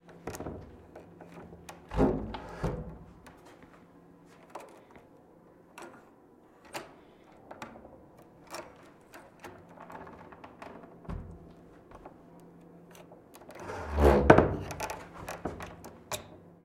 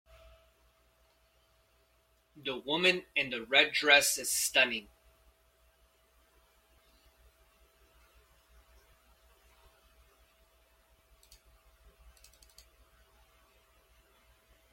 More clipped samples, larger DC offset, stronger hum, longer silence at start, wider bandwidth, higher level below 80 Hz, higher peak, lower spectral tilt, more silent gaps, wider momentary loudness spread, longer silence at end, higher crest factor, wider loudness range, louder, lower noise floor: neither; neither; neither; second, 0.1 s vs 2.35 s; about the same, 16.5 kHz vs 16.5 kHz; first, -44 dBFS vs -68 dBFS; first, -2 dBFS vs -8 dBFS; first, -6.5 dB/octave vs -0.5 dB/octave; neither; first, 25 LU vs 16 LU; second, 0.25 s vs 9.9 s; about the same, 32 dB vs 30 dB; first, 21 LU vs 8 LU; second, -31 LUFS vs -27 LUFS; second, -59 dBFS vs -70 dBFS